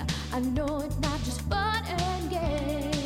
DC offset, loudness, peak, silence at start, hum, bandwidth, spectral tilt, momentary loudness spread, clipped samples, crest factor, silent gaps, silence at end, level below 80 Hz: under 0.1%; -30 LUFS; -14 dBFS; 0 s; none; 16 kHz; -5 dB/octave; 3 LU; under 0.1%; 16 dB; none; 0 s; -36 dBFS